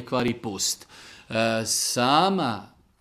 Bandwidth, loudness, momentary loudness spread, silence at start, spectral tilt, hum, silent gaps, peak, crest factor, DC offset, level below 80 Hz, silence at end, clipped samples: 16 kHz; -24 LUFS; 12 LU; 0 s; -3 dB/octave; none; none; -6 dBFS; 20 dB; under 0.1%; -58 dBFS; 0.35 s; under 0.1%